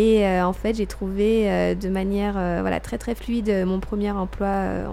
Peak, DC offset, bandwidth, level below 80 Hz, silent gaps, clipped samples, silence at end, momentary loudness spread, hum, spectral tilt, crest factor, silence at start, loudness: -8 dBFS; under 0.1%; 15 kHz; -36 dBFS; none; under 0.1%; 0 s; 7 LU; none; -7 dB/octave; 14 dB; 0 s; -23 LUFS